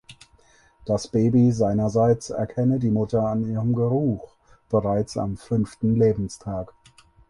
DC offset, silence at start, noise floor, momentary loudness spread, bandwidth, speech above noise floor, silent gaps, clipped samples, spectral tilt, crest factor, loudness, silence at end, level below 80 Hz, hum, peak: under 0.1%; 0.1 s; -57 dBFS; 10 LU; 11.5 kHz; 35 dB; none; under 0.1%; -8 dB/octave; 16 dB; -23 LUFS; 0.65 s; -48 dBFS; none; -8 dBFS